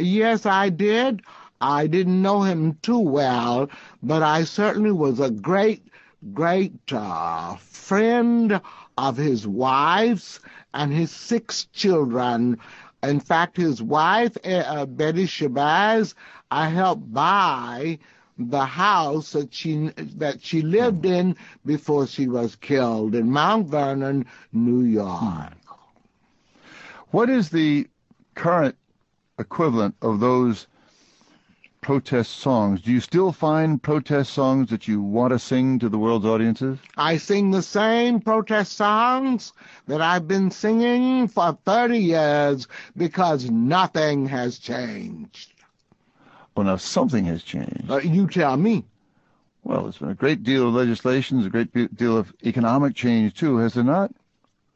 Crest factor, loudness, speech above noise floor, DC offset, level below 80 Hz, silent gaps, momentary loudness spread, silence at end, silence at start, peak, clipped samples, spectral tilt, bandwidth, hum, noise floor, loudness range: 18 dB; -22 LUFS; 48 dB; under 0.1%; -58 dBFS; none; 10 LU; 0.65 s; 0 s; -4 dBFS; under 0.1%; -6.5 dB/octave; 8 kHz; none; -69 dBFS; 3 LU